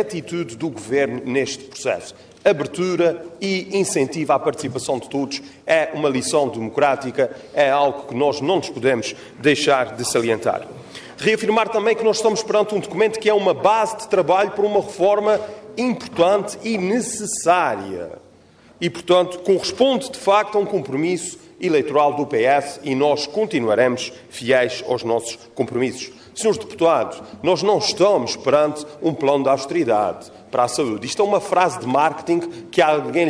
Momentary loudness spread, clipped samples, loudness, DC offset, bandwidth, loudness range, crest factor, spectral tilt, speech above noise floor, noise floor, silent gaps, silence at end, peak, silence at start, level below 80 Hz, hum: 9 LU; under 0.1%; -20 LUFS; under 0.1%; 11 kHz; 3 LU; 16 dB; -4 dB/octave; 30 dB; -49 dBFS; none; 0 s; -2 dBFS; 0 s; -62 dBFS; none